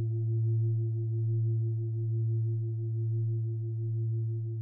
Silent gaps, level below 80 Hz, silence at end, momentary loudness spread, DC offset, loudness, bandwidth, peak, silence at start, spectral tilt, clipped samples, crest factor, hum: none; -68 dBFS; 0 s; 4 LU; under 0.1%; -32 LUFS; 0.7 kHz; -24 dBFS; 0 s; -16 dB/octave; under 0.1%; 6 dB; none